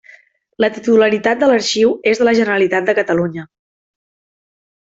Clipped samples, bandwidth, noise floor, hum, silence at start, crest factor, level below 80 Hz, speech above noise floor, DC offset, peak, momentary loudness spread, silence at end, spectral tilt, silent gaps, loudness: under 0.1%; 8 kHz; -47 dBFS; none; 0.6 s; 14 dB; -58 dBFS; 33 dB; under 0.1%; -2 dBFS; 6 LU; 1.5 s; -4.5 dB/octave; none; -14 LUFS